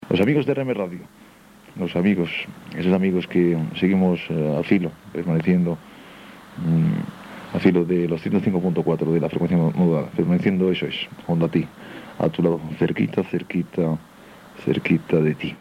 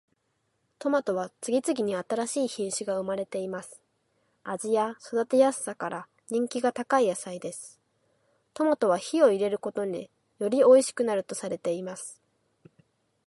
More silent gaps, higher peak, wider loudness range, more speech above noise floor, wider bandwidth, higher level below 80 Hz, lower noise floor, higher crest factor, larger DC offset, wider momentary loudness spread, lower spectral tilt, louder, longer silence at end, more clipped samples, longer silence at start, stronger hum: neither; first, -4 dBFS vs -8 dBFS; second, 3 LU vs 6 LU; second, 27 dB vs 49 dB; second, 9.6 kHz vs 11.5 kHz; first, -58 dBFS vs -78 dBFS; second, -48 dBFS vs -75 dBFS; about the same, 18 dB vs 20 dB; neither; second, 11 LU vs 16 LU; first, -8.5 dB/octave vs -4.5 dB/octave; first, -22 LUFS vs -27 LUFS; second, 0.05 s vs 1.15 s; neither; second, 0 s vs 0.8 s; neither